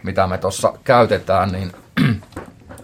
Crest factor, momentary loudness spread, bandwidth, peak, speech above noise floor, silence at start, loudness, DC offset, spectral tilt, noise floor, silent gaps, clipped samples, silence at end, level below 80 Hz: 18 dB; 13 LU; 16.5 kHz; 0 dBFS; 19 dB; 0.05 s; -18 LUFS; under 0.1%; -6 dB/octave; -36 dBFS; none; under 0.1%; 0 s; -50 dBFS